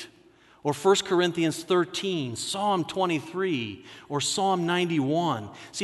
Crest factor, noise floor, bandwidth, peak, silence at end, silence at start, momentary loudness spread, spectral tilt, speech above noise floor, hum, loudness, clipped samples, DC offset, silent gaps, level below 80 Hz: 18 dB; -57 dBFS; 12 kHz; -10 dBFS; 0 s; 0 s; 11 LU; -4.5 dB/octave; 31 dB; none; -26 LUFS; under 0.1%; under 0.1%; none; -68 dBFS